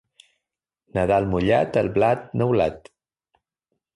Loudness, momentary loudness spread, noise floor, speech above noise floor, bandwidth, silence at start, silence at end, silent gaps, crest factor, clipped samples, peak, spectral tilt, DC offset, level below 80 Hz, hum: -22 LUFS; 5 LU; -85 dBFS; 65 dB; 11 kHz; 0.95 s; 1.15 s; none; 16 dB; under 0.1%; -6 dBFS; -8 dB/octave; under 0.1%; -46 dBFS; none